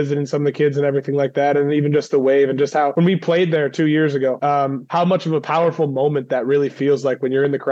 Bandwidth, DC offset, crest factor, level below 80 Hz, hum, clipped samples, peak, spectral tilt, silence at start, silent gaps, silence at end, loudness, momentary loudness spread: 7.8 kHz; under 0.1%; 10 dB; -78 dBFS; none; under 0.1%; -6 dBFS; -7.5 dB/octave; 0 s; none; 0 s; -18 LUFS; 3 LU